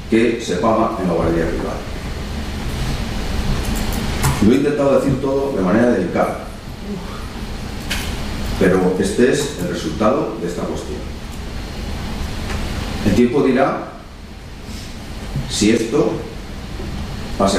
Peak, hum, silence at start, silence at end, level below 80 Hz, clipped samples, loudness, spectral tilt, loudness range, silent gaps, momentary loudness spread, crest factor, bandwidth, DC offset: -4 dBFS; none; 0 s; 0 s; -30 dBFS; under 0.1%; -19 LUFS; -5.5 dB/octave; 5 LU; none; 15 LU; 16 dB; 15.5 kHz; under 0.1%